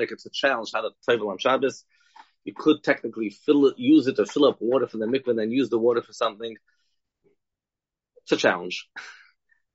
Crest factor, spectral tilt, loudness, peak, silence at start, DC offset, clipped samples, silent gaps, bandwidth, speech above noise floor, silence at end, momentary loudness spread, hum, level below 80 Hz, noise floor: 20 dB; -3 dB/octave; -24 LUFS; -6 dBFS; 0 s; under 0.1%; under 0.1%; none; 8 kHz; 66 dB; 0.65 s; 17 LU; none; -74 dBFS; -89 dBFS